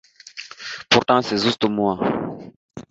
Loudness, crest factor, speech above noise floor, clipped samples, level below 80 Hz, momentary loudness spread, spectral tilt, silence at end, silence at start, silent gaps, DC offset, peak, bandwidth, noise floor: -19 LUFS; 20 dB; 21 dB; under 0.1%; -56 dBFS; 22 LU; -4.5 dB/octave; 0.1 s; 0.25 s; 2.56-2.69 s; under 0.1%; -2 dBFS; 8 kHz; -40 dBFS